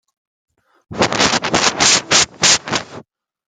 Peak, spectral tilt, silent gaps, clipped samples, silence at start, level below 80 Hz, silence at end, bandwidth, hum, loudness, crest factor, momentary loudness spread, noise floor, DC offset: 0 dBFS; -1 dB/octave; none; under 0.1%; 0.9 s; -48 dBFS; 0.45 s; 16.5 kHz; none; -13 LUFS; 18 dB; 11 LU; -42 dBFS; under 0.1%